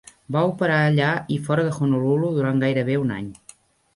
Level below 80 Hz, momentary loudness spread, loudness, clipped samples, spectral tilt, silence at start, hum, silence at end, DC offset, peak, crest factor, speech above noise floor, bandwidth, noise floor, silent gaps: -58 dBFS; 8 LU; -21 LUFS; under 0.1%; -7.5 dB/octave; 0.3 s; none; 0.65 s; under 0.1%; -8 dBFS; 14 dB; 30 dB; 11.5 kHz; -51 dBFS; none